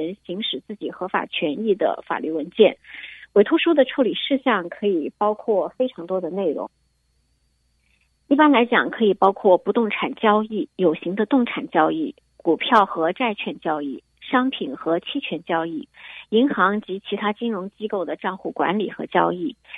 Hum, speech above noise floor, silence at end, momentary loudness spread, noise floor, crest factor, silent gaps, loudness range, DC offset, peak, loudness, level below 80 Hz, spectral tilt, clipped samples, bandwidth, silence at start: none; 45 dB; 0 s; 12 LU; -66 dBFS; 20 dB; none; 5 LU; under 0.1%; 0 dBFS; -21 LUFS; -68 dBFS; -7.5 dB/octave; under 0.1%; 5.8 kHz; 0 s